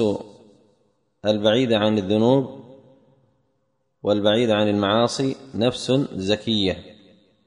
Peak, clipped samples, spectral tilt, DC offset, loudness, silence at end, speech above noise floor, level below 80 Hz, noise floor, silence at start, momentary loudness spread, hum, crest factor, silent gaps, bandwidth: -4 dBFS; under 0.1%; -5.5 dB/octave; under 0.1%; -21 LUFS; 0.55 s; 51 dB; -58 dBFS; -71 dBFS; 0 s; 8 LU; none; 18 dB; none; 10.5 kHz